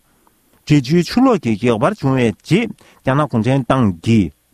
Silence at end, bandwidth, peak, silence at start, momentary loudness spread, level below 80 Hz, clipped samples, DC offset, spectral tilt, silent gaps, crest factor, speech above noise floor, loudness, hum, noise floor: 0.25 s; 13.5 kHz; -2 dBFS; 0.65 s; 4 LU; -44 dBFS; under 0.1%; under 0.1%; -7 dB/octave; none; 14 dB; 41 dB; -16 LUFS; none; -56 dBFS